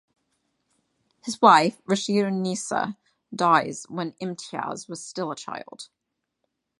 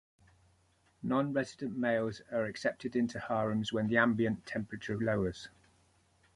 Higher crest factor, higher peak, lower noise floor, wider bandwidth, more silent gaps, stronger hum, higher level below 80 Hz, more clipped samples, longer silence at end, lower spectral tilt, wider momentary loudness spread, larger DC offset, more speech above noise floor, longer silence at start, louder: about the same, 24 dB vs 20 dB; first, -2 dBFS vs -14 dBFS; first, -79 dBFS vs -70 dBFS; about the same, 11.5 kHz vs 11.5 kHz; neither; neither; second, -74 dBFS vs -62 dBFS; neither; about the same, 0.95 s vs 0.85 s; second, -4.5 dB/octave vs -6.5 dB/octave; first, 20 LU vs 10 LU; neither; first, 55 dB vs 37 dB; first, 1.25 s vs 1.05 s; first, -24 LUFS vs -34 LUFS